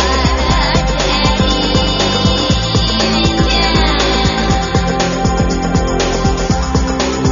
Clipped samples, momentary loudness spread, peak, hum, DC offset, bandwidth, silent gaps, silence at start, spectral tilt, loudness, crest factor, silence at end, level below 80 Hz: under 0.1%; 3 LU; 0 dBFS; none; under 0.1%; 7.4 kHz; none; 0 s; -4 dB/octave; -13 LUFS; 12 dB; 0 s; -20 dBFS